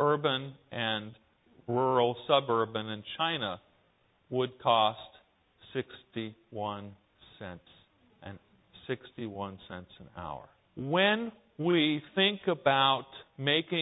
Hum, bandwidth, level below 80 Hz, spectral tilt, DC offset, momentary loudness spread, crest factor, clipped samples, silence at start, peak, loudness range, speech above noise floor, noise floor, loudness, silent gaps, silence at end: none; 4 kHz; -68 dBFS; -9 dB/octave; under 0.1%; 22 LU; 22 dB; under 0.1%; 0 s; -10 dBFS; 15 LU; 38 dB; -69 dBFS; -30 LUFS; none; 0 s